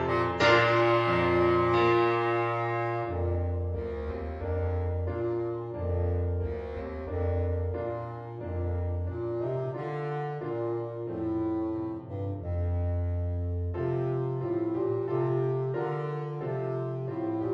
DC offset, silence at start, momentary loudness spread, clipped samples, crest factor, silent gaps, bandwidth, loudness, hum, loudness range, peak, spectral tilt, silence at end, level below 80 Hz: under 0.1%; 0 s; 11 LU; under 0.1%; 20 dB; none; 7.4 kHz; -30 LUFS; none; 7 LU; -10 dBFS; -8 dB/octave; 0 s; -44 dBFS